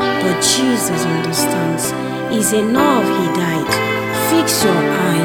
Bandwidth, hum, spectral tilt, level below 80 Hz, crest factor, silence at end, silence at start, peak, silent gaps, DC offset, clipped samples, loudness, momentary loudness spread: over 20 kHz; none; -4 dB/octave; -52 dBFS; 14 dB; 0 s; 0 s; -2 dBFS; none; 0.1%; under 0.1%; -15 LUFS; 5 LU